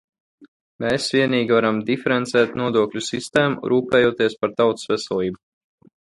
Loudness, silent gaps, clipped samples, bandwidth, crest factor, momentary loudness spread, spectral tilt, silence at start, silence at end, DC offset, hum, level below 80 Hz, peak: -20 LUFS; 0.48-0.79 s; under 0.1%; 11.5 kHz; 18 dB; 7 LU; -5 dB/octave; 0.4 s; 0.8 s; under 0.1%; none; -58 dBFS; -2 dBFS